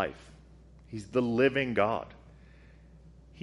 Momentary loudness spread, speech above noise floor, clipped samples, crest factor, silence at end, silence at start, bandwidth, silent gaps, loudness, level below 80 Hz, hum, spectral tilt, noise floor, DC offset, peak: 20 LU; 25 dB; under 0.1%; 22 dB; 0 s; 0 s; 11.5 kHz; none; -29 LUFS; -56 dBFS; none; -6.5 dB/octave; -54 dBFS; under 0.1%; -12 dBFS